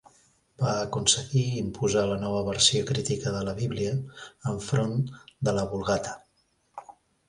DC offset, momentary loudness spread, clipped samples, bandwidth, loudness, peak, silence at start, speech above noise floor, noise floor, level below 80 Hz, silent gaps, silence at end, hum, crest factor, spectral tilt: under 0.1%; 16 LU; under 0.1%; 11.5 kHz; -27 LUFS; -8 dBFS; 0.6 s; 42 dB; -69 dBFS; -52 dBFS; none; 0.4 s; none; 20 dB; -4 dB/octave